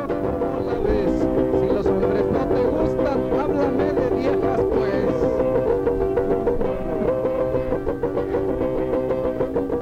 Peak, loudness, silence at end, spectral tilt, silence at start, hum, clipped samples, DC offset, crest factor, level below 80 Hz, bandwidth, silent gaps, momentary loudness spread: -8 dBFS; -21 LUFS; 0 s; -8.5 dB/octave; 0 s; none; under 0.1%; under 0.1%; 12 dB; -36 dBFS; 8.4 kHz; none; 4 LU